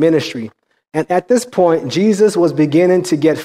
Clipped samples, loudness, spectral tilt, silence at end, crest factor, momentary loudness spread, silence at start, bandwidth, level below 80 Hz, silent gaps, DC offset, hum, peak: under 0.1%; -14 LUFS; -6 dB/octave; 0 s; 12 dB; 11 LU; 0 s; 15 kHz; -60 dBFS; none; under 0.1%; none; -2 dBFS